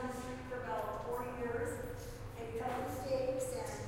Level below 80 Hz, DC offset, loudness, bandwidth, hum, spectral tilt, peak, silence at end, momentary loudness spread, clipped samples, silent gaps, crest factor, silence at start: -54 dBFS; under 0.1%; -41 LUFS; 16 kHz; none; -5.5 dB/octave; -24 dBFS; 0 s; 8 LU; under 0.1%; none; 16 dB; 0 s